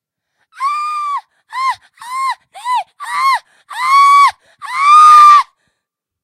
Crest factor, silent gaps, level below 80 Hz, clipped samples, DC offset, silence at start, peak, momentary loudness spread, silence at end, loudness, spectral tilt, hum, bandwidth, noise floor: 12 dB; none; -68 dBFS; 0.4%; under 0.1%; 0.6 s; 0 dBFS; 20 LU; 0.8 s; -10 LUFS; 2.5 dB/octave; none; 14 kHz; -76 dBFS